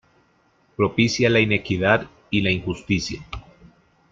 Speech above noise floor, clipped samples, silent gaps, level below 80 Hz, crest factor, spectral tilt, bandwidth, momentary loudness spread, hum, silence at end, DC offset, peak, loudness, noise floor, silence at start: 41 dB; under 0.1%; none; -48 dBFS; 20 dB; -5.5 dB/octave; 7.8 kHz; 17 LU; none; 0.7 s; under 0.1%; -4 dBFS; -21 LUFS; -61 dBFS; 0.8 s